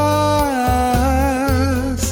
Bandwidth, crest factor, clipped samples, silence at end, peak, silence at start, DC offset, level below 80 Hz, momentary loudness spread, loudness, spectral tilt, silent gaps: over 20 kHz; 14 dB; under 0.1%; 0 s; -2 dBFS; 0 s; under 0.1%; -24 dBFS; 2 LU; -17 LUFS; -5.5 dB/octave; none